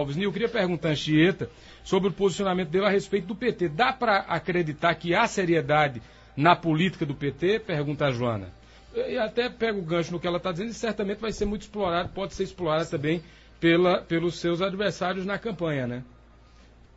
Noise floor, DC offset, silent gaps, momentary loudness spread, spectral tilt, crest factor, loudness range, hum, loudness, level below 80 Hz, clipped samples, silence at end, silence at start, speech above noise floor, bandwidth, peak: -53 dBFS; under 0.1%; none; 9 LU; -6 dB/octave; 20 dB; 5 LU; none; -26 LUFS; -50 dBFS; under 0.1%; 0.9 s; 0 s; 27 dB; 8 kHz; -6 dBFS